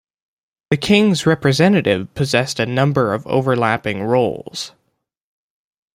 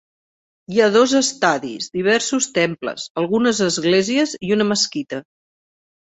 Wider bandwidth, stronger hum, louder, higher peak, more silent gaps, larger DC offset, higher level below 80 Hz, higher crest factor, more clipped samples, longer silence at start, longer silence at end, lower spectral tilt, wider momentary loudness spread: first, 15.5 kHz vs 8.4 kHz; neither; about the same, -17 LUFS vs -18 LUFS; about the same, -2 dBFS vs -2 dBFS; second, none vs 3.10-3.15 s; neither; first, -52 dBFS vs -62 dBFS; about the same, 16 dB vs 18 dB; neither; about the same, 0.7 s vs 0.7 s; first, 1.3 s vs 0.95 s; first, -5.5 dB/octave vs -3.5 dB/octave; about the same, 9 LU vs 11 LU